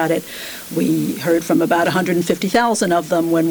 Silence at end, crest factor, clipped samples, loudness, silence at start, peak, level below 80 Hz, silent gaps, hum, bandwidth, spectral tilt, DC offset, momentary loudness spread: 0 s; 12 dB; under 0.1%; -17 LUFS; 0 s; -6 dBFS; -56 dBFS; none; none; over 20 kHz; -5 dB/octave; under 0.1%; 6 LU